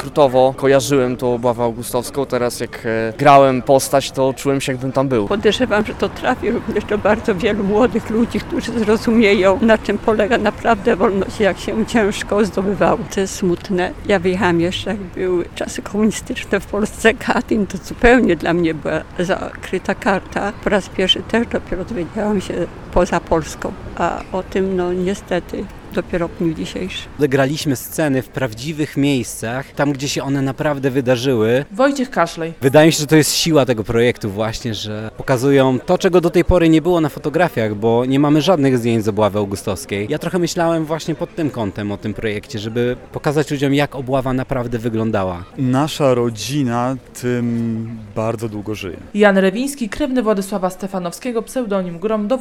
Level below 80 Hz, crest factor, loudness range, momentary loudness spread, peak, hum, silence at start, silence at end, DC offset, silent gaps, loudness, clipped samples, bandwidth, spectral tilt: -36 dBFS; 16 dB; 5 LU; 10 LU; 0 dBFS; none; 0 s; 0 s; under 0.1%; none; -17 LUFS; under 0.1%; 17.5 kHz; -5.5 dB/octave